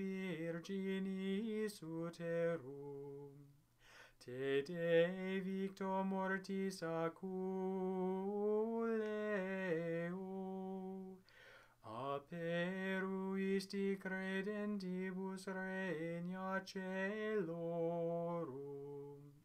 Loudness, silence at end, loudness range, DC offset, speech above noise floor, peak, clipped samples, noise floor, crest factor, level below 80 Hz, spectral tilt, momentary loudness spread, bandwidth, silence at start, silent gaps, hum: -42 LUFS; 0.05 s; 5 LU; under 0.1%; 26 dB; -24 dBFS; under 0.1%; -67 dBFS; 20 dB; -82 dBFS; -7 dB/octave; 12 LU; 13.5 kHz; 0 s; none; none